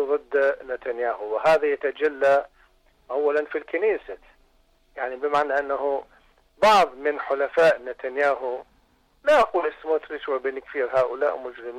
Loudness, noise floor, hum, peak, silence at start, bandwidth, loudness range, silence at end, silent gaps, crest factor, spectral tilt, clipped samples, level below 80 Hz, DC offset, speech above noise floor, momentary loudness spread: -23 LUFS; -62 dBFS; none; -10 dBFS; 0 s; 14 kHz; 4 LU; 0 s; none; 14 dB; -4 dB/octave; under 0.1%; -60 dBFS; under 0.1%; 39 dB; 12 LU